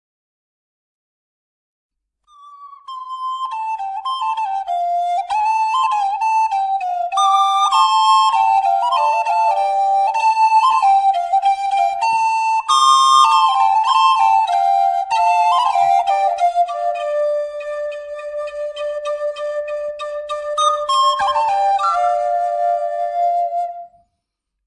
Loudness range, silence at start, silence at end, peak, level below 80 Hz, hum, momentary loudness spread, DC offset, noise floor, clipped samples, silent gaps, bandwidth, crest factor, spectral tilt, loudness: 10 LU; 2.45 s; 0.8 s; -4 dBFS; -62 dBFS; none; 12 LU; under 0.1%; -77 dBFS; under 0.1%; none; 11.5 kHz; 14 dB; 1.5 dB/octave; -16 LUFS